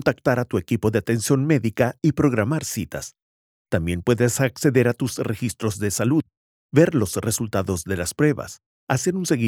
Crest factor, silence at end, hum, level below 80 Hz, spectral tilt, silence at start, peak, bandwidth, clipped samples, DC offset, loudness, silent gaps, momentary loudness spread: 18 dB; 0 s; none; -50 dBFS; -5.5 dB/octave; 0 s; -4 dBFS; 18 kHz; under 0.1%; under 0.1%; -22 LUFS; 3.22-3.65 s, 6.37-6.69 s, 8.66-8.87 s; 8 LU